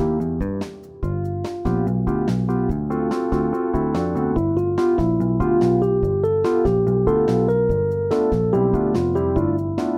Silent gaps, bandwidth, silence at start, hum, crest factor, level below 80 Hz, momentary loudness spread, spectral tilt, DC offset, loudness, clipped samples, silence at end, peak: none; 10.5 kHz; 0 s; none; 12 dB; -34 dBFS; 7 LU; -9.5 dB/octave; under 0.1%; -21 LUFS; under 0.1%; 0 s; -6 dBFS